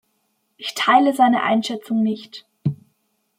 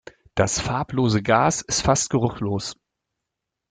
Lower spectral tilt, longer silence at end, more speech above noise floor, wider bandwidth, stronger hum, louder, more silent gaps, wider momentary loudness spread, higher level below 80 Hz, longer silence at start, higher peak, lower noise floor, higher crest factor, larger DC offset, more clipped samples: about the same, -5 dB/octave vs -4.5 dB/octave; second, 0.65 s vs 0.95 s; second, 51 dB vs 62 dB; first, 16 kHz vs 9.6 kHz; neither; first, -19 LUFS vs -22 LUFS; neither; first, 16 LU vs 9 LU; second, -68 dBFS vs -44 dBFS; first, 0.6 s vs 0.35 s; about the same, -2 dBFS vs -4 dBFS; second, -69 dBFS vs -83 dBFS; about the same, 18 dB vs 20 dB; neither; neither